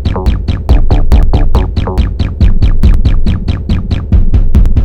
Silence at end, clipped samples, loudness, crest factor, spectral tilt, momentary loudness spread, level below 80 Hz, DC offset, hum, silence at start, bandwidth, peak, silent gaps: 0 s; 3%; -12 LUFS; 6 dB; -8.5 dB/octave; 4 LU; -8 dBFS; under 0.1%; none; 0 s; 5.4 kHz; 0 dBFS; none